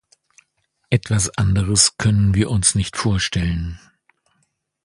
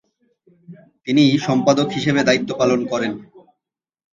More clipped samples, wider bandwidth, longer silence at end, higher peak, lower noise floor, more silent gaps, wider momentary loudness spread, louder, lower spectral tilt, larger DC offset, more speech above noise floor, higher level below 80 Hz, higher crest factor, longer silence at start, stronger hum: neither; first, 11.5 kHz vs 7.6 kHz; first, 1.05 s vs 0.75 s; about the same, -2 dBFS vs 0 dBFS; second, -68 dBFS vs -84 dBFS; neither; about the same, 8 LU vs 10 LU; about the same, -18 LUFS vs -18 LUFS; second, -4 dB/octave vs -5.5 dB/octave; neither; second, 50 dB vs 67 dB; first, -34 dBFS vs -60 dBFS; about the same, 20 dB vs 20 dB; first, 0.9 s vs 0.7 s; neither